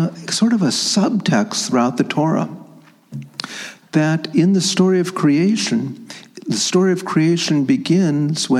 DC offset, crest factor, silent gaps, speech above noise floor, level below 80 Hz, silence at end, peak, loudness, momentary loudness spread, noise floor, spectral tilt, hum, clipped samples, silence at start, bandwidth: under 0.1%; 16 dB; none; 28 dB; -68 dBFS; 0 s; -2 dBFS; -17 LUFS; 15 LU; -45 dBFS; -5 dB/octave; none; under 0.1%; 0 s; 13.5 kHz